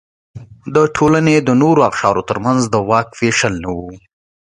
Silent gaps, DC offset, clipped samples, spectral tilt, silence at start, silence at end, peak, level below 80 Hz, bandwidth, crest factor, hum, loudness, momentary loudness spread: none; under 0.1%; under 0.1%; -5.5 dB/octave; 0.35 s; 0.45 s; 0 dBFS; -44 dBFS; 11 kHz; 14 dB; none; -14 LUFS; 12 LU